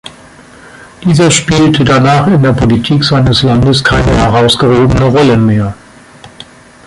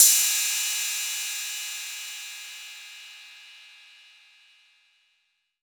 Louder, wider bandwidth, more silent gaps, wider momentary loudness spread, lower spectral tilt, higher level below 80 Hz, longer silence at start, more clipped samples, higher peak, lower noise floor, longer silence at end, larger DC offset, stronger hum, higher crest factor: first, -8 LUFS vs -25 LUFS; second, 11.5 kHz vs over 20 kHz; neither; second, 3 LU vs 24 LU; first, -5.5 dB/octave vs 7.5 dB/octave; first, -26 dBFS vs under -90 dBFS; about the same, 0.05 s vs 0 s; neither; about the same, 0 dBFS vs -2 dBFS; second, -35 dBFS vs -73 dBFS; second, 0.45 s vs 1.95 s; neither; neither; second, 8 dB vs 26 dB